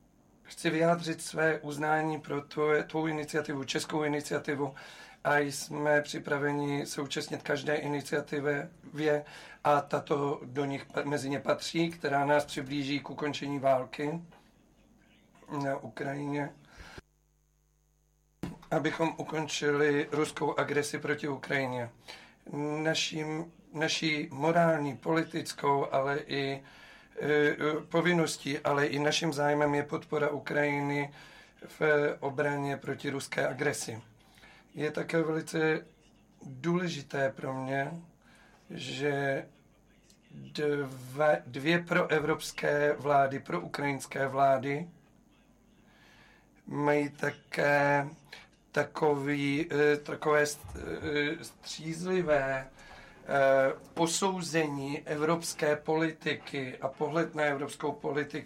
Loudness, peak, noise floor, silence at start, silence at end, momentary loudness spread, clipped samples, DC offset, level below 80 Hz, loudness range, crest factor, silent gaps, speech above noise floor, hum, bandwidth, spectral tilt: -31 LUFS; -16 dBFS; -70 dBFS; 0.45 s; 0 s; 11 LU; under 0.1%; under 0.1%; -64 dBFS; 6 LU; 16 dB; none; 39 dB; none; 16 kHz; -5 dB/octave